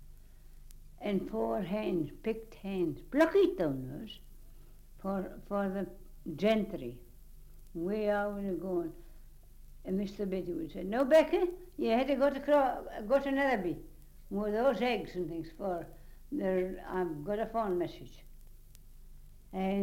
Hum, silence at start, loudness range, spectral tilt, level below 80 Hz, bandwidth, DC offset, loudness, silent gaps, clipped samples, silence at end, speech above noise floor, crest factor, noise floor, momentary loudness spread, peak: none; 0 s; 7 LU; -7 dB/octave; -52 dBFS; 16.5 kHz; under 0.1%; -33 LUFS; none; under 0.1%; 0 s; 20 dB; 20 dB; -52 dBFS; 15 LU; -14 dBFS